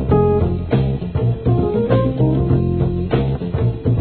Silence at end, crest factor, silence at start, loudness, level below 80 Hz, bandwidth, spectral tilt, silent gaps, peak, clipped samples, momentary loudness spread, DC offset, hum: 0 s; 14 dB; 0 s; -18 LUFS; -28 dBFS; 4.4 kHz; -13 dB/octave; none; -2 dBFS; under 0.1%; 4 LU; 0.3%; none